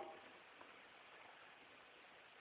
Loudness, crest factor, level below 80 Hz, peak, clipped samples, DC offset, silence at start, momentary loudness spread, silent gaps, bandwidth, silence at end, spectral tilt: -61 LUFS; 20 dB; under -90 dBFS; -40 dBFS; under 0.1%; under 0.1%; 0 s; 3 LU; none; 4 kHz; 0 s; -0.5 dB/octave